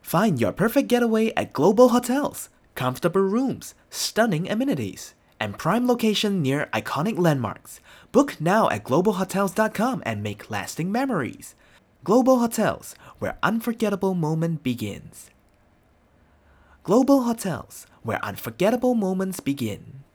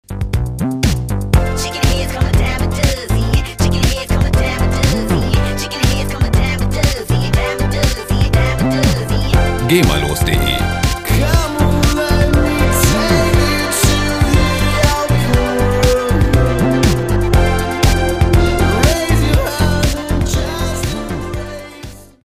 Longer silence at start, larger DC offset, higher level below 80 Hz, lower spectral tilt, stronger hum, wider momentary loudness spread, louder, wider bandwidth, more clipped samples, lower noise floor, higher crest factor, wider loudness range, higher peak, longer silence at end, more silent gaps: about the same, 0.05 s vs 0.1 s; neither; second, -58 dBFS vs -18 dBFS; about the same, -5.5 dB/octave vs -5 dB/octave; neither; first, 15 LU vs 6 LU; second, -23 LUFS vs -15 LUFS; first, over 20 kHz vs 16 kHz; neither; first, -59 dBFS vs -33 dBFS; first, 20 dB vs 14 dB; about the same, 4 LU vs 3 LU; second, -4 dBFS vs 0 dBFS; about the same, 0.15 s vs 0.25 s; neither